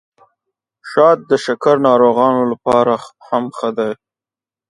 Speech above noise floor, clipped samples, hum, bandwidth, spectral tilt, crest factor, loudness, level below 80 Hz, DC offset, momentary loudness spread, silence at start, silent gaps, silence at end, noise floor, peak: over 76 dB; under 0.1%; none; 11 kHz; -6 dB/octave; 16 dB; -15 LUFS; -60 dBFS; under 0.1%; 10 LU; 0.85 s; none; 0.75 s; under -90 dBFS; 0 dBFS